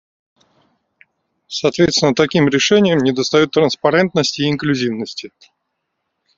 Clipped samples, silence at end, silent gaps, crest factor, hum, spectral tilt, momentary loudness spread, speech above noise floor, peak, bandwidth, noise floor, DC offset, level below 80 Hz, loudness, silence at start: under 0.1%; 1.1 s; none; 16 dB; none; -4.5 dB/octave; 9 LU; 58 dB; 0 dBFS; 7.8 kHz; -74 dBFS; under 0.1%; -54 dBFS; -15 LUFS; 1.5 s